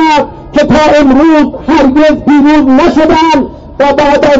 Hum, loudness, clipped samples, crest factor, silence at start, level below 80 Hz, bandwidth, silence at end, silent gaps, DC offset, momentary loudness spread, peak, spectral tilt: none; -6 LUFS; under 0.1%; 6 dB; 0 s; -28 dBFS; 7.8 kHz; 0 s; none; under 0.1%; 6 LU; 0 dBFS; -5.5 dB/octave